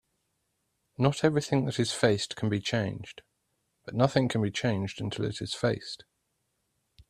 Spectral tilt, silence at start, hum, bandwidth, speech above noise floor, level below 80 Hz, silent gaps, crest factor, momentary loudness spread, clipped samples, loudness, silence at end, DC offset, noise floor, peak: -5.5 dB/octave; 1 s; none; 14 kHz; 50 dB; -62 dBFS; none; 22 dB; 13 LU; under 0.1%; -29 LUFS; 1.15 s; under 0.1%; -78 dBFS; -8 dBFS